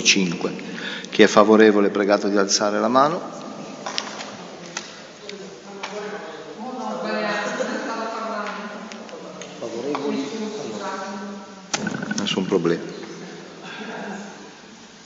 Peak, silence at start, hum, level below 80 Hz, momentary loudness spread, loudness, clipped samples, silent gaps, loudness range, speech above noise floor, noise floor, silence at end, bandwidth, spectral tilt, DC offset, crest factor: 0 dBFS; 0 s; none; -70 dBFS; 19 LU; -22 LUFS; under 0.1%; none; 13 LU; 25 dB; -44 dBFS; 0 s; 8 kHz; -3.5 dB/octave; under 0.1%; 24 dB